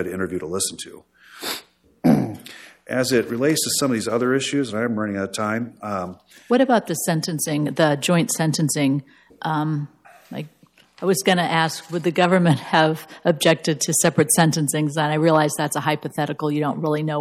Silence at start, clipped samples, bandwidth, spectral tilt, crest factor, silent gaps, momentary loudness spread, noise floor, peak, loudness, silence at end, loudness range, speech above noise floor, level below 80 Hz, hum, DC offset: 0 s; under 0.1%; 16.5 kHz; -4.5 dB/octave; 18 dB; none; 11 LU; -43 dBFS; -4 dBFS; -21 LUFS; 0 s; 5 LU; 22 dB; -64 dBFS; none; under 0.1%